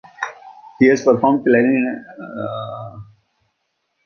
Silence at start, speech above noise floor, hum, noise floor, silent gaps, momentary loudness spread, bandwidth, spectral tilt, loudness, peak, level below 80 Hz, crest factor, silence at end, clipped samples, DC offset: 0.2 s; 55 dB; none; -71 dBFS; none; 18 LU; 7 kHz; -6.5 dB/octave; -17 LUFS; 0 dBFS; -58 dBFS; 18 dB; 1.05 s; under 0.1%; under 0.1%